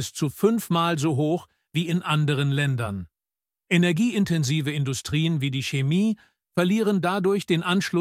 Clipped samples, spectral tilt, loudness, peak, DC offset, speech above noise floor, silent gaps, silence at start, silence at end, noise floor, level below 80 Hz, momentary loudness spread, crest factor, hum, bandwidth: under 0.1%; -6 dB/octave; -24 LUFS; -6 dBFS; under 0.1%; over 67 dB; none; 0 s; 0 s; under -90 dBFS; -58 dBFS; 7 LU; 16 dB; none; 16 kHz